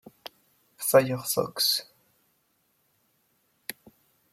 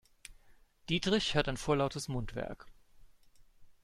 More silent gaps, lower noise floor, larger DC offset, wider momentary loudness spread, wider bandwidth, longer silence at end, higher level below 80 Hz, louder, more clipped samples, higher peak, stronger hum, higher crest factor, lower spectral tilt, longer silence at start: neither; first, -71 dBFS vs -62 dBFS; neither; first, 24 LU vs 15 LU; first, 16.5 kHz vs 13.5 kHz; first, 0.6 s vs 0.1 s; second, -74 dBFS vs -52 dBFS; first, -25 LUFS vs -34 LUFS; neither; first, -6 dBFS vs -14 dBFS; neither; about the same, 24 dB vs 22 dB; second, -3 dB/octave vs -4.5 dB/octave; first, 0.8 s vs 0.3 s